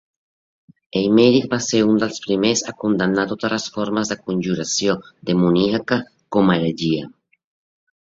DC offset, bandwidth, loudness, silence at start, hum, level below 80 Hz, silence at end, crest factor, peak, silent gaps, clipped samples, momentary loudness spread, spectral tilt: under 0.1%; 8 kHz; -19 LUFS; 0.95 s; none; -56 dBFS; 0.9 s; 18 dB; -2 dBFS; none; under 0.1%; 8 LU; -5 dB/octave